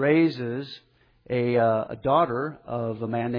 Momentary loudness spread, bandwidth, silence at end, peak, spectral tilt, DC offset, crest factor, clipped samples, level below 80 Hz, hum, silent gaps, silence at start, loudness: 11 LU; 5.4 kHz; 0 s; -8 dBFS; -9.5 dB/octave; under 0.1%; 16 dB; under 0.1%; -60 dBFS; none; none; 0 s; -25 LUFS